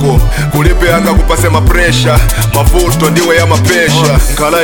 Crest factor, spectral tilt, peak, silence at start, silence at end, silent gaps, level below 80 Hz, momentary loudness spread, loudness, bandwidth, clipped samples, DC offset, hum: 8 dB; -5 dB/octave; 0 dBFS; 0 s; 0 s; none; -12 dBFS; 2 LU; -9 LUFS; 19.5 kHz; 3%; 2%; none